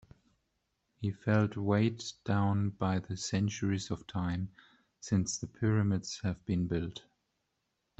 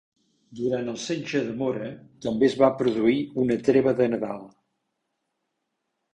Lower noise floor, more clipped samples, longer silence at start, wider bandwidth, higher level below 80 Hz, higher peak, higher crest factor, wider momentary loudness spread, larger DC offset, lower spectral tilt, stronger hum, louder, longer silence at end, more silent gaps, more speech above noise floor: about the same, -82 dBFS vs -79 dBFS; neither; first, 1 s vs 0.5 s; second, 8.2 kHz vs 10 kHz; about the same, -62 dBFS vs -62 dBFS; second, -16 dBFS vs -6 dBFS; about the same, 18 dB vs 20 dB; second, 9 LU vs 12 LU; neither; about the same, -6 dB/octave vs -6 dB/octave; neither; second, -33 LUFS vs -24 LUFS; second, 1 s vs 1.65 s; neither; second, 50 dB vs 55 dB